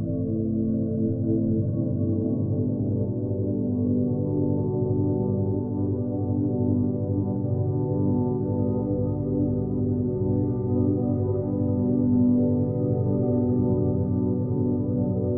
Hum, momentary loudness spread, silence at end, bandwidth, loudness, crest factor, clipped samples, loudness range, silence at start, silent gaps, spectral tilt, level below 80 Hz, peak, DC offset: none; 3 LU; 0 s; 1.6 kHz; -25 LUFS; 12 dB; under 0.1%; 2 LU; 0 s; none; -14.5 dB/octave; -46 dBFS; -10 dBFS; under 0.1%